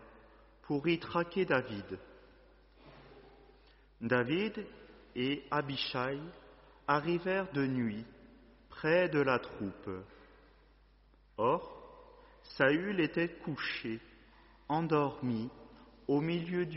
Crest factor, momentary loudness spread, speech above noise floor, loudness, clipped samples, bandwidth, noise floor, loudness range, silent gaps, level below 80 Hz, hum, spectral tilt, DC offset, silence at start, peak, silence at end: 22 dB; 18 LU; 31 dB; -34 LUFS; under 0.1%; 5.8 kHz; -64 dBFS; 4 LU; none; -64 dBFS; none; -4.5 dB/octave; under 0.1%; 0 s; -14 dBFS; 0 s